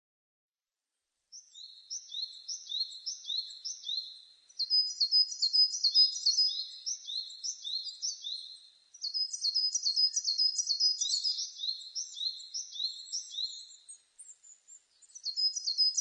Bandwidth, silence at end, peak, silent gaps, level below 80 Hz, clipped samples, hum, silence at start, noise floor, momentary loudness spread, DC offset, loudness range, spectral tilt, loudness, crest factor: 10 kHz; 0 s; -16 dBFS; none; under -90 dBFS; under 0.1%; none; 1.35 s; under -90 dBFS; 16 LU; under 0.1%; 12 LU; 8 dB/octave; -30 LUFS; 20 dB